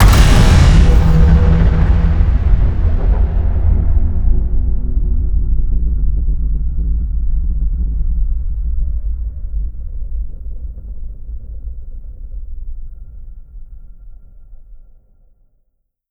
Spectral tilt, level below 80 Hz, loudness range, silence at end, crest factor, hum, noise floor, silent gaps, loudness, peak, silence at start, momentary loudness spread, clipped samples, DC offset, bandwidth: -6.5 dB/octave; -14 dBFS; 21 LU; 1.3 s; 12 dB; none; -63 dBFS; none; -16 LUFS; 0 dBFS; 0 s; 22 LU; under 0.1%; under 0.1%; 13.5 kHz